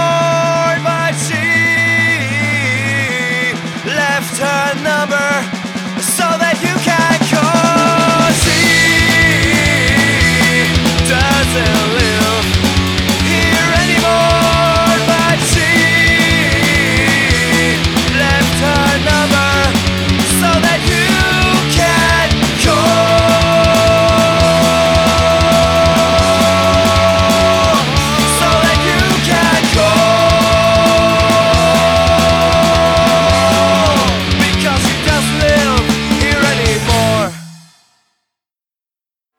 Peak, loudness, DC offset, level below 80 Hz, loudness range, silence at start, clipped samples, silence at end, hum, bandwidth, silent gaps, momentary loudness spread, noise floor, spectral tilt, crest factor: 0 dBFS; -11 LUFS; under 0.1%; -26 dBFS; 4 LU; 0 s; under 0.1%; 1.8 s; none; 20 kHz; none; 4 LU; under -90 dBFS; -4 dB/octave; 10 dB